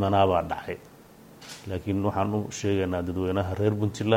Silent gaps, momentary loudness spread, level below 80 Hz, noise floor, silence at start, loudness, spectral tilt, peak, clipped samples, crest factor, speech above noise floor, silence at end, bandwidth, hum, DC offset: none; 16 LU; -56 dBFS; -50 dBFS; 0 s; -27 LUFS; -6.5 dB/octave; -8 dBFS; under 0.1%; 18 dB; 25 dB; 0 s; 16 kHz; none; under 0.1%